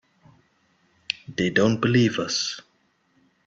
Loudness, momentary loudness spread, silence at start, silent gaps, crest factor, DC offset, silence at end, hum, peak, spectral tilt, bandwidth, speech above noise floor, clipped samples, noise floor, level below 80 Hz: -23 LUFS; 11 LU; 1.1 s; none; 22 dB; under 0.1%; 0.85 s; none; -4 dBFS; -5 dB/octave; 8 kHz; 44 dB; under 0.1%; -66 dBFS; -60 dBFS